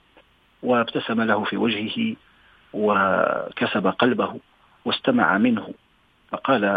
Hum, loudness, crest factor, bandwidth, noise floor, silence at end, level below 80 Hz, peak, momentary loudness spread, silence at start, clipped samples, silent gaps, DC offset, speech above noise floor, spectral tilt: none; -22 LUFS; 20 dB; 4.9 kHz; -57 dBFS; 0 s; -64 dBFS; -2 dBFS; 13 LU; 0.65 s; under 0.1%; none; under 0.1%; 35 dB; -8 dB/octave